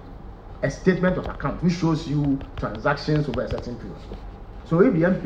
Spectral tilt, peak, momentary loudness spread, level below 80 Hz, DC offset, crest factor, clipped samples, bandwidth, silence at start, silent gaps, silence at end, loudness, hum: -7.5 dB/octave; -4 dBFS; 21 LU; -38 dBFS; under 0.1%; 20 dB; under 0.1%; 8 kHz; 0 s; none; 0 s; -23 LUFS; none